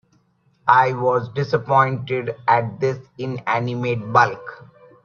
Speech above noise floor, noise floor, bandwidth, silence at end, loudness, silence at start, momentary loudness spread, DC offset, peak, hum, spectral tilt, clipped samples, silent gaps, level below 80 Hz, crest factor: 41 dB; -61 dBFS; 7 kHz; 0.4 s; -20 LUFS; 0.65 s; 11 LU; under 0.1%; 0 dBFS; none; -7 dB/octave; under 0.1%; none; -62 dBFS; 20 dB